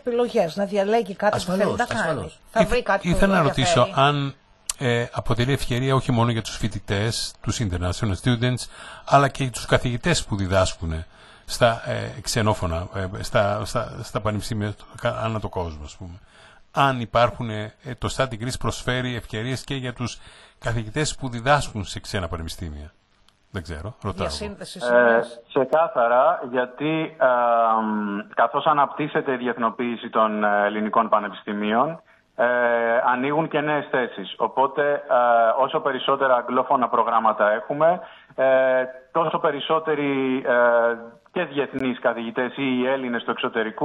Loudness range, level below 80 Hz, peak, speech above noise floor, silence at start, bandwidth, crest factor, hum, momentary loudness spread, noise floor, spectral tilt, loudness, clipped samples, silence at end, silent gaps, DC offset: 6 LU; -42 dBFS; -2 dBFS; 37 dB; 0.05 s; 12 kHz; 20 dB; none; 12 LU; -60 dBFS; -5 dB/octave; -22 LUFS; under 0.1%; 0 s; none; under 0.1%